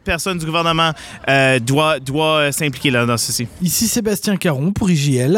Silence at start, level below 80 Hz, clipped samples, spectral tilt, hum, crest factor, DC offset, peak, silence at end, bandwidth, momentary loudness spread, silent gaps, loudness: 0.05 s; -40 dBFS; under 0.1%; -4 dB/octave; none; 14 dB; under 0.1%; -4 dBFS; 0 s; 18 kHz; 5 LU; none; -16 LUFS